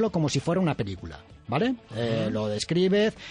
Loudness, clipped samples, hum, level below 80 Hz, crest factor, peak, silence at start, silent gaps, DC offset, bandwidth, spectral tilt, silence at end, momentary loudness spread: -26 LUFS; under 0.1%; none; -54 dBFS; 14 dB; -12 dBFS; 0 s; none; under 0.1%; 10.5 kHz; -6 dB/octave; 0 s; 11 LU